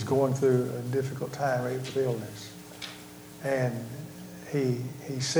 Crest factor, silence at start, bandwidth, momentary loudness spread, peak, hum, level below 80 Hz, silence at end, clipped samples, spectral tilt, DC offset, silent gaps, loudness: 18 dB; 0 s; over 20 kHz; 17 LU; -12 dBFS; none; -66 dBFS; 0 s; under 0.1%; -5.5 dB/octave; under 0.1%; none; -30 LUFS